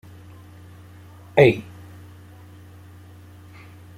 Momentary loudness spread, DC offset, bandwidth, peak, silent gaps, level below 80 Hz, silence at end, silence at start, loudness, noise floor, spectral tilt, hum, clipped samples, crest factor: 29 LU; under 0.1%; 15.5 kHz; -2 dBFS; none; -58 dBFS; 2.35 s; 1.35 s; -18 LUFS; -44 dBFS; -7.5 dB/octave; none; under 0.1%; 24 dB